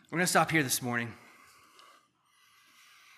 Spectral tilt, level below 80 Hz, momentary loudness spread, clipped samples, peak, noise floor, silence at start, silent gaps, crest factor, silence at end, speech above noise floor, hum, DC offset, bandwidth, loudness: -3.5 dB/octave; -74 dBFS; 9 LU; under 0.1%; -12 dBFS; -67 dBFS; 0.1 s; none; 22 dB; 2 s; 38 dB; none; under 0.1%; 15 kHz; -28 LUFS